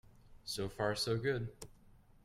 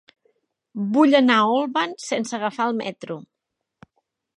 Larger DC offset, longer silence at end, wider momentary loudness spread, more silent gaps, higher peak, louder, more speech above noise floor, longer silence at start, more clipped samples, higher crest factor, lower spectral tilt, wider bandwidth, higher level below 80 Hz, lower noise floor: neither; second, 0.55 s vs 1.15 s; about the same, 19 LU vs 19 LU; neither; second, -22 dBFS vs -2 dBFS; second, -38 LUFS vs -20 LUFS; second, 25 dB vs 61 dB; second, 0.05 s vs 0.75 s; neither; about the same, 18 dB vs 20 dB; about the same, -4.5 dB/octave vs -4.5 dB/octave; first, 16 kHz vs 11 kHz; first, -60 dBFS vs -76 dBFS; second, -63 dBFS vs -81 dBFS